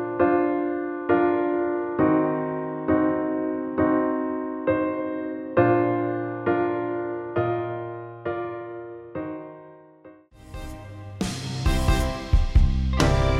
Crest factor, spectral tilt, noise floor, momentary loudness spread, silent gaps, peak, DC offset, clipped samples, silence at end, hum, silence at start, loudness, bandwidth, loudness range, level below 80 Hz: 20 dB; -7 dB/octave; -50 dBFS; 15 LU; none; -4 dBFS; under 0.1%; under 0.1%; 0 s; none; 0 s; -25 LUFS; 14.5 kHz; 11 LU; -30 dBFS